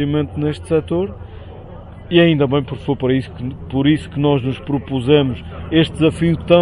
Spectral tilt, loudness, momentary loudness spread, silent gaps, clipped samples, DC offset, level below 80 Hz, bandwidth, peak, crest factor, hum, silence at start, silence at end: -7.5 dB/octave; -17 LUFS; 20 LU; none; under 0.1%; under 0.1%; -36 dBFS; 11 kHz; 0 dBFS; 16 dB; none; 0 s; 0 s